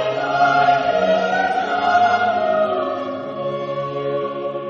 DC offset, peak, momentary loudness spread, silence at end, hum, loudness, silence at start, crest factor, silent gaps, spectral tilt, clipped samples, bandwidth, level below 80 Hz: under 0.1%; -4 dBFS; 9 LU; 0 s; none; -19 LUFS; 0 s; 14 dB; none; -5.5 dB/octave; under 0.1%; 7.2 kHz; -60 dBFS